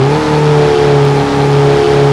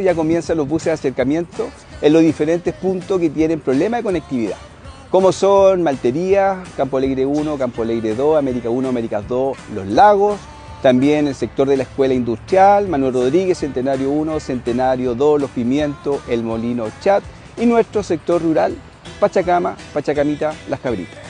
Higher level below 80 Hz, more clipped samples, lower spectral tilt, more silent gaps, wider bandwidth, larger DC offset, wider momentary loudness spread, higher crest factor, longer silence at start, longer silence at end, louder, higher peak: first, -32 dBFS vs -44 dBFS; first, 0.1% vs under 0.1%; about the same, -7 dB/octave vs -6.5 dB/octave; neither; about the same, 10.5 kHz vs 10 kHz; neither; second, 2 LU vs 10 LU; second, 8 dB vs 16 dB; about the same, 0 s vs 0 s; about the same, 0 s vs 0 s; first, -9 LUFS vs -17 LUFS; about the same, 0 dBFS vs 0 dBFS